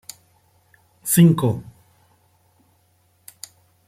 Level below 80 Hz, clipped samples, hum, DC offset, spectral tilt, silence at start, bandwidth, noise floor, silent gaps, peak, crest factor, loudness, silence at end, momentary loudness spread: -60 dBFS; under 0.1%; none; under 0.1%; -6 dB/octave; 1.05 s; 16 kHz; -62 dBFS; none; -2 dBFS; 20 dB; -18 LUFS; 2.25 s; 26 LU